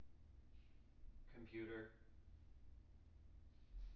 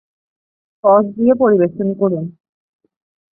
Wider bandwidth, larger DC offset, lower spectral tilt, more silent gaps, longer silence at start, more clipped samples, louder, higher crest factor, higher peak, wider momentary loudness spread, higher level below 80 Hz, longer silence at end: first, 6 kHz vs 2.9 kHz; neither; second, -6 dB/octave vs -14.5 dB/octave; neither; second, 0 s vs 0.85 s; neither; second, -60 LUFS vs -15 LUFS; about the same, 18 dB vs 16 dB; second, -40 dBFS vs 0 dBFS; first, 16 LU vs 8 LU; about the same, -62 dBFS vs -60 dBFS; second, 0 s vs 1 s